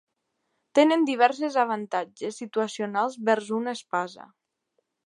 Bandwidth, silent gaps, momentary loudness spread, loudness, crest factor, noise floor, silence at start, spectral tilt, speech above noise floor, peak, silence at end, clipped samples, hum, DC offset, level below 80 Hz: 11.5 kHz; none; 10 LU; -25 LUFS; 22 dB; -78 dBFS; 0.75 s; -4.5 dB/octave; 52 dB; -6 dBFS; 0.8 s; under 0.1%; none; under 0.1%; -84 dBFS